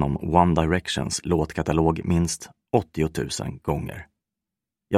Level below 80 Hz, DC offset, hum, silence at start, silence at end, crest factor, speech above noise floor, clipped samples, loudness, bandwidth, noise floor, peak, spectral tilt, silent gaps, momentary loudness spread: -40 dBFS; under 0.1%; none; 0 s; 0 s; 22 dB; 63 dB; under 0.1%; -24 LUFS; 14.5 kHz; -87 dBFS; -2 dBFS; -5.5 dB/octave; none; 9 LU